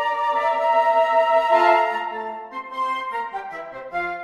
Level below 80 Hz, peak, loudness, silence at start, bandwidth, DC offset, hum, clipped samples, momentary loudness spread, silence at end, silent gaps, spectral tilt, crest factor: -64 dBFS; -4 dBFS; -20 LUFS; 0 s; 12 kHz; under 0.1%; none; under 0.1%; 15 LU; 0 s; none; -3.5 dB/octave; 16 dB